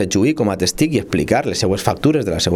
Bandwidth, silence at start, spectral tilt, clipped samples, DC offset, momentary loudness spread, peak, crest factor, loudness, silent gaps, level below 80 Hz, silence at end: 19 kHz; 0 s; -5 dB/octave; under 0.1%; under 0.1%; 2 LU; 0 dBFS; 16 dB; -17 LUFS; none; -40 dBFS; 0 s